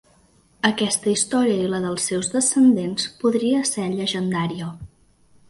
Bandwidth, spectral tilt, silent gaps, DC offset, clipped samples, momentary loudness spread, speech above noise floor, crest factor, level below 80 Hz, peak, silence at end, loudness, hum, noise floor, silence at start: 11.5 kHz; -4 dB/octave; none; under 0.1%; under 0.1%; 9 LU; 36 dB; 20 dB; -56 dBFS; -2 dBFS; 0.65 s; -21 LUFS; none; -57 dBFS; 0.65 s